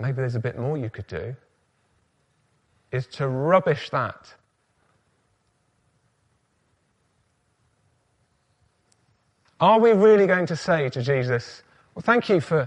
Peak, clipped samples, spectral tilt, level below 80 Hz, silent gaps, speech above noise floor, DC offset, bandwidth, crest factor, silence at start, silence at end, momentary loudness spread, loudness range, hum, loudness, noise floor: -4 dBFS; under 0.1%; -7 dB/octave; -62 dBFS; none; 47 dB; under 0.1%; 9.2 kHz; 20 dB; 0 s; 0 s; 18 LU; 12 LU; none; -22 LUFS; -69 dBFS